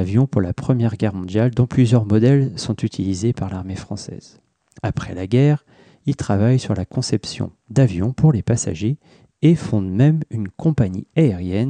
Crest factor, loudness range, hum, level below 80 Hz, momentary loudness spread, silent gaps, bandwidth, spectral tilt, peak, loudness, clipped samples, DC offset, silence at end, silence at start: 14 dB; 4 LU; none; -46 dBFS; 12 LU; none; 9.6 kHz; -7.5 dB/octave; -4 dBFS; -19 LUFS; under 0.1%; under 0.1%; 0 s; 0 s